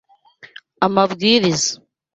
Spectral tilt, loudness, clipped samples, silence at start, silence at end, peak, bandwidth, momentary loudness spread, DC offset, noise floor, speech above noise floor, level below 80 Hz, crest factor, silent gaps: -3.5 dB/octave; -17 LUFS; under 0.1%; 0.8 s; 0.4 s; -2 dBFS; 8.4 kHz; 7 LU; under 0.1%; -47 dBFS; 31 dB; -58 dBFS; 18 dB; none